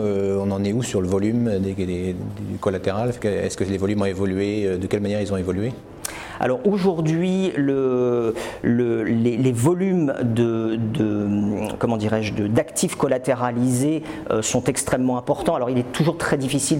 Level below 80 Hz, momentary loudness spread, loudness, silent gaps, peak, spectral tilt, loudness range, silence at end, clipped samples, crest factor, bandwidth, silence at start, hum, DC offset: -50 dBFS; 5 LU; -22 LUFS; none; -6 dBFS; -6 dB/octave; 3 LU; 0 s; under 0.1%; 16 dB; 16.5 kHz; 0 s; none; under 0.1%